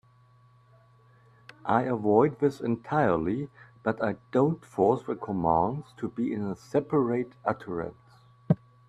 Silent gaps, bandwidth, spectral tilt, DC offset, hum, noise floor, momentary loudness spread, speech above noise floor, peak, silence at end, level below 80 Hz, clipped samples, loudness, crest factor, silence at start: none; 10.5 kHz; -9 dB/octave; under 0.1%; none; -59 dBFS; 10 LU; 32 dB; -8 dBFS; 0.35 s; -60 dBFS; under 0.1%; -28 LUFS; 22 dB; 1.65 s